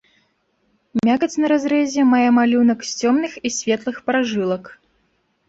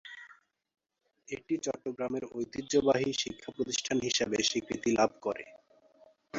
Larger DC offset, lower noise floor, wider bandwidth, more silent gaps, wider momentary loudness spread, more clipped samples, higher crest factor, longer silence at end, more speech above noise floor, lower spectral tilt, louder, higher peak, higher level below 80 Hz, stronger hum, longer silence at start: neither; second, -65 dBFS vs -75 dBFS; about the same, 7.8 kHz vs 8 kHz; neither; second, 9 LU vs 14 LU; neither; second, 14 dB vs 22 dB; first, 0.75 s vs 0 s; first, 48 dB vs 44 dB; first, -4.5 dB/octave vs -3 dB/octave; first, -18 LUFS vs -32 LUFS; first, -6 dBFS vs -12 dBFS; first, -60 dBFS vs -66 dBFS; neither; first, 0.95 s vs 0.05 s